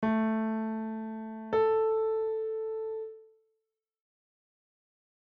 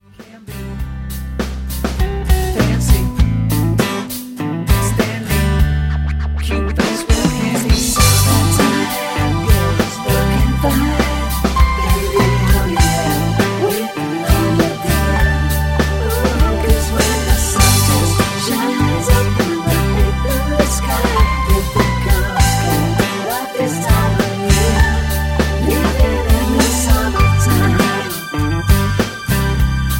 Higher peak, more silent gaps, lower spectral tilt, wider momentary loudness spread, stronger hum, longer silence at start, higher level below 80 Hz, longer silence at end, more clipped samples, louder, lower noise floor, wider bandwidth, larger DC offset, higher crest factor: second, -18 dBFS vs 0 dBFS; neither; first, -6.5 dB/octave vs -5 dB/octave; first, 12 LU vs 6 LU; neither; second, 0 s vs 0.2 s; second, -70 dBFS vs -18 dBFS; first, 2.15 s vs 0 s; neither; second, -31 LUFS vs -15 LUFS; first, -84 dBFS vs -37 dBFS; second, 4.9 kHz vs 17 kHz; neither; about the same, 14 dB vs 14 dB